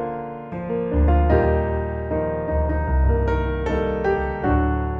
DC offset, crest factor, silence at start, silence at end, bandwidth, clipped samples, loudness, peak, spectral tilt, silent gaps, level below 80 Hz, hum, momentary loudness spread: under 0.1%; 14 dB; 0 s; 0 s; 4.3 kHz; under 0.1%; -22 LUFS; -6 dBFS; -10 dB/octave; none; -24 dBFS; none; 8 LU